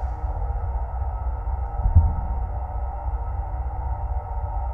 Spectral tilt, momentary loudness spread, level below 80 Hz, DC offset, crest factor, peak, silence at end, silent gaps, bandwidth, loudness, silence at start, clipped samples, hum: -11.5 dB/octave; 9 LU; -26 dBFS; under 0.1%; 20 dB; -4 dBFS; 0 s; none; 2.3 kHz; -27 LUFS; 0 s; under 0.1%; none